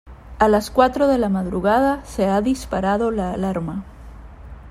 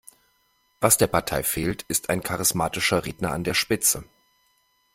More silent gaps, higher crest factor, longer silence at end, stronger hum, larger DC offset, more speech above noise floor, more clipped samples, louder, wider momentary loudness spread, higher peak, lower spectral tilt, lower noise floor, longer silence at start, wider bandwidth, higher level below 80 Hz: neither; second, 18 dB vs 24 dB; second, 0 s vs 0.9 s; neither; neither; second, 20 dB vs 43 dB; neither; first, -20 LUFS vs -23 LUFS; about the same, 8 LU vs 8 LU; about the same, -2 dBFS vs -2 dBFS; first, -6.5 dB/octave vs -3 dB/octave; second, -39 dBFS vs -67 dBFS; second, 0.05 s vs 0.8 s; about the same, 15.5 kHz vs 16.5 kHz; first, -38 dBFS vs -48 dBFS